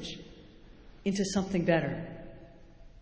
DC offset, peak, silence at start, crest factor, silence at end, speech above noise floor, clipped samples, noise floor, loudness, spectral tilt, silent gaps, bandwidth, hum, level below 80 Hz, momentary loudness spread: under 0.1%; -12 dBFS; 0 s; 22 dB; 0 s; 23 dB; under 0.1%; -52 dBFS; -31 LUFS; -5.5 dB/octave; none; 8 kHz; none; -54 dBFS; 23 LU